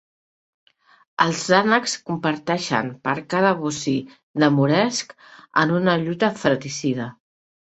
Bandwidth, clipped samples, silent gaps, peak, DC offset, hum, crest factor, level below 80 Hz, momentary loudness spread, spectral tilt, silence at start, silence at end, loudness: 8.4 kHz; under 0.1%; 4.23-4.34 s; -2 dBFS; under 0.1%; none; 20 dB; -62 dBFS; 10 LU; -5 dB/octave; 1.2 s; 0.6 s; -21 LUFS